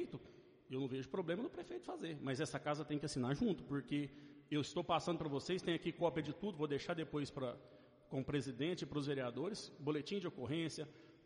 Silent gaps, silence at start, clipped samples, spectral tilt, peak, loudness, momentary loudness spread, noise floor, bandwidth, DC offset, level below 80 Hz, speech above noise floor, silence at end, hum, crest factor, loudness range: none; 0 s; under 0.1%; -6 dB/octave; -24 dBFS; -42 LUFS; 9 LU; -62 dBFS; 10.5 kHz; under 0.1%; -70 dBFS; 21 dB; 0.1 s; none; 18 dB; 2 LU